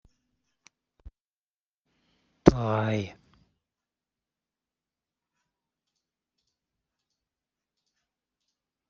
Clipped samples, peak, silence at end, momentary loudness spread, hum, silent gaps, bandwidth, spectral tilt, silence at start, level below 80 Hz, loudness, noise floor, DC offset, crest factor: under 0.1%; -2 dBFS; 5.8 s; 12 LU; none; none; 7.6 kHz; -7 dB/octave; 2.45 s; -52 dBFS; -25 LUFS; under -90 dBFS; under 0.1%; 32 dB